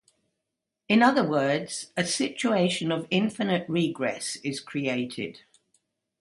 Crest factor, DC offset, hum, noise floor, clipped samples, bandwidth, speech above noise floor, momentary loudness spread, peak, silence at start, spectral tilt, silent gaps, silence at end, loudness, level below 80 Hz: 20 dB; under 0.1%; none; -84 dBFS; under 0.1%; 11.5 kHz; 58 dB; 11 LU; -8 dBFS; 0.9 s; -4.5 dB/octave; none; 0.85 s; -26 LUFS; -70 dBFS